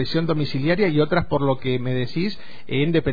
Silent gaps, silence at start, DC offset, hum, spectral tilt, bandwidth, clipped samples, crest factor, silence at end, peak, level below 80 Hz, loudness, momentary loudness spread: none; 0 s; 4%; none; -8.5 dB/octave; 5 kHz; under 0.1%; 14 dB; 0 s; -6 dBFS; -44 dBFS; -22 LUFS; 8 LU